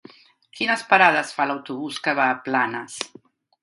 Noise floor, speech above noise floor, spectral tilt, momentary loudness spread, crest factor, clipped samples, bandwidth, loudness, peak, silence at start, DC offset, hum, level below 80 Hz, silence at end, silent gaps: -52 dBFS; 31 dB; -3 dB/octave; 15 LU; 24 dB; under 0.1%; 11.5 kHz; -21 LUFS; 0 dBFS; 0.55 s; under 0.1%; none; -74 dBFS; 0.55 s; none